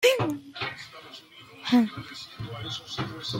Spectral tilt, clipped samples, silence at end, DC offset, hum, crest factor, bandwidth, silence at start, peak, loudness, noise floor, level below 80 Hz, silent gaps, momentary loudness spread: -4.5 dB/octave; under 0.1%; 0 s; under 0.1%; none; 22 dB; 16.5 kHz; 0 s; -8 dBFS; -29 LUFS; -48 dBFS; -62 dBFS; none; 21 LU